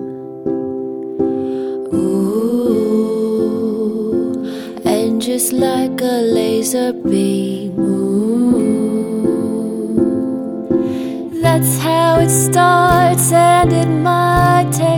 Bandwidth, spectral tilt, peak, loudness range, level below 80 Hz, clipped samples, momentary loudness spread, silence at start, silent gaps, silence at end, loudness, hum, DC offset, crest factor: over 20 kHz; -5.5 dB/octave; 0 dBFS; 5 LU; -40 dBFS; under 0.1%; 10 LU; 0 s; none; 0 s; -15 LUFS; none; under 0.1%; 14 dB